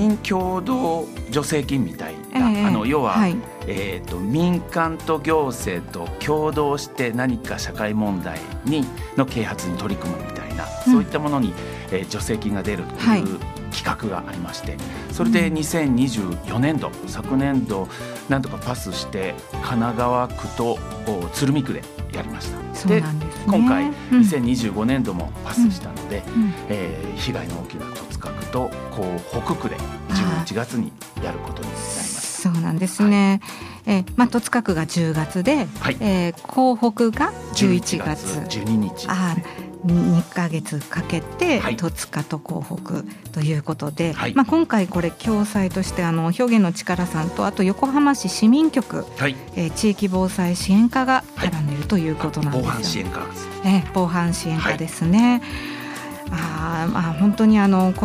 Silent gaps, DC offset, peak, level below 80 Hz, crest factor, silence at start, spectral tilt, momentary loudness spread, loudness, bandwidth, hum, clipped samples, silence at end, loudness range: none; under 0.1%; -2 dBFS; -40 dBFS; 18 dB; 0 s; -6 dB/octave; 12 LU; -22 LUFS; 15.5 kHz; none; under 0.1%; 0 s; 5 LU